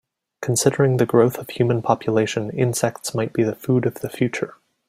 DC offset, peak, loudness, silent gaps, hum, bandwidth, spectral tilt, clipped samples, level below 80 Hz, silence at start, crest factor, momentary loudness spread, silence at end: under 0.1%; -2 dBFS; -21 LUFS; none; none; 16 kHz; -5.5 dB/octave; under 0.1%; -58 dBFS; 0.4 s; 18 dB; 8 LU; 0.4 s